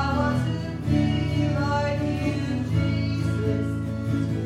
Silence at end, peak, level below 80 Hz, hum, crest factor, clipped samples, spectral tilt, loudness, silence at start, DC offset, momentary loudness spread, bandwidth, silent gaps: 0 s; -10 dBFS; -38 dBFS; none; 14 dB; under 0.1%; -7.5 dB/octave; -25 LUFS; 0 s; under 0.1%; 4 LU; 11 kHz; none